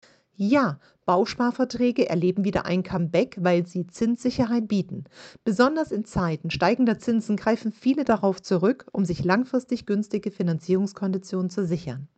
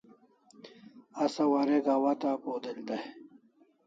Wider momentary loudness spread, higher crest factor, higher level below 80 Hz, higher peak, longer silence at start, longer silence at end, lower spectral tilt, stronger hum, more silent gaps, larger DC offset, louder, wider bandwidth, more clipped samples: second, 6 LU vs 20 LU; about the same, 18 dB vs 16 dB; first, -54 dBFS vs -84 dBFS; first, -6 dBFS vs -16 dBFS; second, 0.4 s vs 0.65 s; second, 0.1 s vs 0.65 s; first, -7 dB/octave vs -5.5 dB/octave; neither; neither; neither; first, -24 LUFS vs -30 LUFS; first, 8.8 kHz vs 7.8 kHz; neither